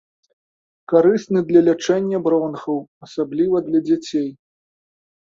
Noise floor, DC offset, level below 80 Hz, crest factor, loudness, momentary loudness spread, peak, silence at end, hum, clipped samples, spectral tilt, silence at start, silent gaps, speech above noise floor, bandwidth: under -90 dBFS; under 0.1%; -62 dBFS; 18 dB; -19 LUFS; 11 LU; -2 dBFS; 1 s; none; under 0.1%; -6.5 dB/octave; 0.9 s; 2.88-3.01 s; over 72 dB; 7.6 kHz